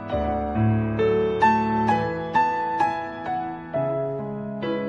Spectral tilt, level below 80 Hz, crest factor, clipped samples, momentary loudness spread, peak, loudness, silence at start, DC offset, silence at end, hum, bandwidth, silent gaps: -8 dB/octave; -44 dBFS; 16 dB; under 0.1%; 10 LU; -8 dBFS; -24 LUFS; 0 s; under 0.1%; 0 s; none; 8 kHz; none